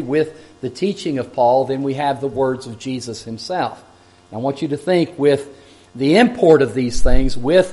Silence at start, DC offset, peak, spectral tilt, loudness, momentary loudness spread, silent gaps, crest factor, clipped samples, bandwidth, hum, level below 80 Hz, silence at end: 0 s; under 0.1%; 0 dBFS; -6 dB/octave; -18 LUFS; 14 LU; none; 16 dB; under 0.1%; 11.5 kHz; none; -26 dBFS; 0 s